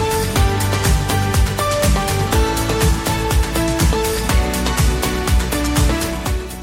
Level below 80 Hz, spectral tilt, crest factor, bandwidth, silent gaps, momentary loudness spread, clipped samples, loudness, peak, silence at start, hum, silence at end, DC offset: -20 dBFS; -4.5 dB/octave; 14 dB; 16.5 kHz; none; 2 LU; under 0.1%; -17 LUFS; -2 dBFS; 0 s; none; 0 s; under 0.1%